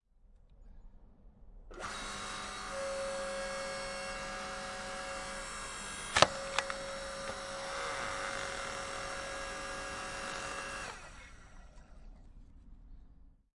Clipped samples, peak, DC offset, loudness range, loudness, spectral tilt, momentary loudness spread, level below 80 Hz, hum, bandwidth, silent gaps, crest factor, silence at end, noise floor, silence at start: under 0.1%; -4 dBFS; under 0.1%; 9 LU; -38 LUFS; -2 dB/octave; 16 LU; -56 dBFS; none; 11.5 kHz; none; 36 dB; 0.2 s; -62 dBFS; 0.25 s